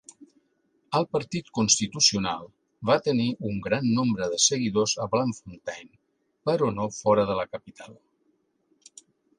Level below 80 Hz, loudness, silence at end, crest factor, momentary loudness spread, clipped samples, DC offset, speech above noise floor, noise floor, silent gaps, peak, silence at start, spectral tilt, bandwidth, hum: -60 dBFS; -25 LUFS; 1.45 s; 22 dB; 15 LU; under 0.1%; under 0.1%; 46 dB; -71 dBFS; none; -6 dBFS; 0.2 s; -3.5 dB/octave; 11 kHz; none